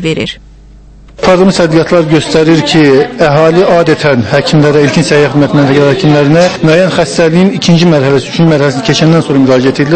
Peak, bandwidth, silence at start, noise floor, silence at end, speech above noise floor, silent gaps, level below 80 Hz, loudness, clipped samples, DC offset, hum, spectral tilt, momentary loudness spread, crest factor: 0 dBFS; 8.8 kHz; 0 s; -34 dBFS; 0 s; 27 dB; none; -36 dBFS; -7 LUFS; 2%; under 0.1%; none; -6 dB/octave; 3 LU; 6 dB